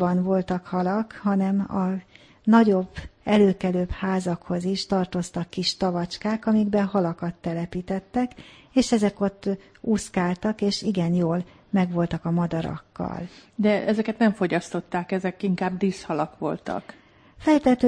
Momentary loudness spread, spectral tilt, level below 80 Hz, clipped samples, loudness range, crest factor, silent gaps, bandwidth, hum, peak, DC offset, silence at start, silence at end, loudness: 10 LU; -6.5 dB/octave; -50 dBFS; under 0.1%; 3 LU; 18 dB; none; 10.5 kHz; none; -4 dBFS; under 0.1%; 0 s; 0 s; -25 LUFS